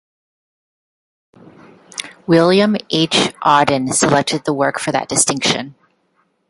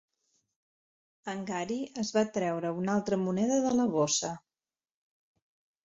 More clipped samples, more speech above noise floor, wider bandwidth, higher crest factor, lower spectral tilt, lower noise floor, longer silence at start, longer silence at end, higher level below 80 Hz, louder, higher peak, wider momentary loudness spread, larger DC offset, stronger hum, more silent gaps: neither; second, 48 dB vs over 60 dB; first, 11.5 kHz vs 8.4 kHz; about the same, 18 dB vs 18 dB; about the same, -3.5 dB/octave vs -4.5 dB/octave; second, -63 dBFS vs under -90 dBFS; first, 1.95 s vs 1.25 s; second, 0.8 s vs 1.45 s; first, -56 dBFS vs -70 dBFS; first, -15 LUFS vs -30 LUFS; first, 0 dBFS vs -14 dBFS; first, 14 LU vs 11 LU; neither; neither; neither